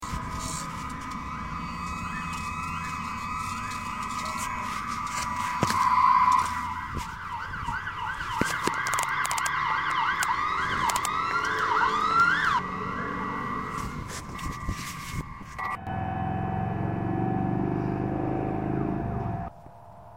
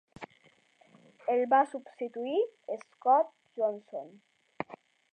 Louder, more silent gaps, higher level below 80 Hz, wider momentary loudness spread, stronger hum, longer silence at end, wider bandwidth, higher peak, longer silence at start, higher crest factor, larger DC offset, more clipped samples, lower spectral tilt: first, -28 LUFS vs -31 LUFS; neither; first, -46 dBFS vs -80 dBFS; second, 12 LU vs 18 LU; neither; second, 0 s vs 0.35 s; first, 16.5 kHz vs 9.2 kHz; first, -6 dBFS vs -12 dBFS; second, 0 s vs 0.2 s; about the same, 22 dB vs 20 dB; first, 0.2% vs under 0.1%; neither; about the same, -4.5 dB/octave vs -5.5 dB/octave